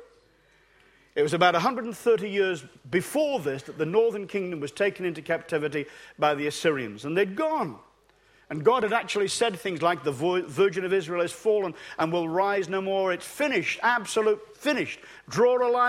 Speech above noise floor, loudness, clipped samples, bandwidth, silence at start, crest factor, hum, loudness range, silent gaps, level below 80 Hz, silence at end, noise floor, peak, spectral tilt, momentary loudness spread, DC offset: 36 dB; -26 LUFS; under 0.1%; 15.5 kHz; 0 s; 20 dB; none; 2 LU; none; -68 dBFS; 0 s; -62 dBFS; -6 dBFS; -4.5 dB/octave; 8 LU; under 0.1%